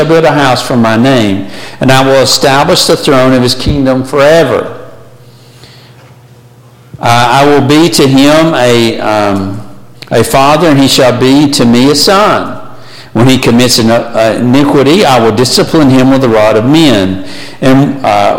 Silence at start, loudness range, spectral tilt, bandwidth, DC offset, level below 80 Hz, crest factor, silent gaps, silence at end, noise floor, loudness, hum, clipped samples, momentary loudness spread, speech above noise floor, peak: 0 s; 5 LU; -5 dB/octave; 17.5 kHz; under 0.1%; -34 dBFS; 6 dB; none; 0 s; -36 dBFS; -6 LUFS; none; 0.3%; 8 LU; 30 dB; 0 dBFS